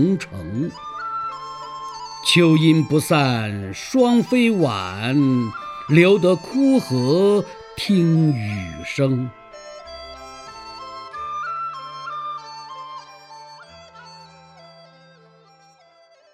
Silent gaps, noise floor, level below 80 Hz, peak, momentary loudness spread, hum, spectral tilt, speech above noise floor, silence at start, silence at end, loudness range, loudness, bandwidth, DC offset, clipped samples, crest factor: none; -53 dBFS; -56 dBFS; -2 dBFS; 21 LU; none; -6 dB/octave; 35 dB; 0 s; 2.1 s; 15 LU; -19 LUFS; 14.5 kHz; under 0.1%; under 0.1%; 20 dB